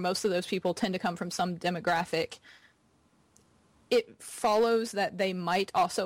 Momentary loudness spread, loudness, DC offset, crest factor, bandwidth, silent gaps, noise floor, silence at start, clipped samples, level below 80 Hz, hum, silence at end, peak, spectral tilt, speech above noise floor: 6 LU; -30 LUFS; under 0.1%; 14 dB; 16.5 kHz; none; -67 dBFS; 0 s; under 0.1%; -68 dBFS; none; 0 s; -18 dBFS; -4.5 dB/octave; 37 dB